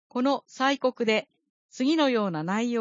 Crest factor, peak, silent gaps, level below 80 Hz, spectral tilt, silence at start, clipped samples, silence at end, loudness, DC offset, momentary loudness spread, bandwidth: 16 dB; -10 dBFS; 1.50-1.69 s; -80 dBFS; -5 dB/octave; 0.15 s; under 0.1%; 0 s; -26 LUFS; under 0.1%; 5 LU; 7.6 kHz